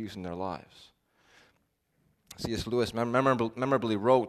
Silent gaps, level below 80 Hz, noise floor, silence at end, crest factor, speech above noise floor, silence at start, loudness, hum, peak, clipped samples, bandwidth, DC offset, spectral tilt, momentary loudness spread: none; -58 dBFS; -74 dBFS; 0 s; 20 dB; 45 dB; 0 s; -30 LUFS; none; -10 dBFS; under 0.1%; 13.5 kHz; under 0.1%; -6 dB/octave; 12 LU